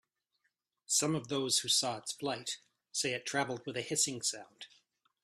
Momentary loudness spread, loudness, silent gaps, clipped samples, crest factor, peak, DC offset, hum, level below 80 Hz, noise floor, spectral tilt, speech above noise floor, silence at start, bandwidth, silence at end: 15 LU; -33 LUFS; none; under 0.1%; 20 dB; -18 dBFS; under 0.1%; none; -78 dBFS; -82 dBFS; -2 dB/octave; 47 dB; 0.9 s; 15.5 kHz; 0.6 s